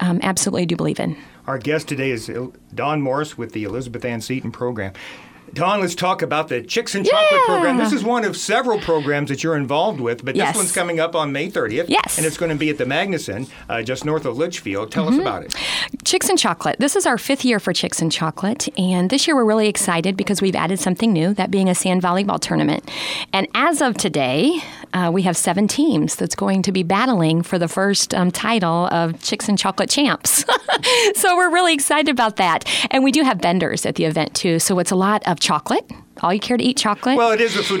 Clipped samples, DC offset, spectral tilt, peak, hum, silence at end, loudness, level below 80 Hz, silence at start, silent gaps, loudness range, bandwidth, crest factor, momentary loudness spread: under 0.1%; under 0.1%; -4 dB/octave; -2 dBFS; none; 0 s; -18 LUFS; -54 dBFS; 0 s; none; 7 LU; 18 kHz; 16 dB; 9 LU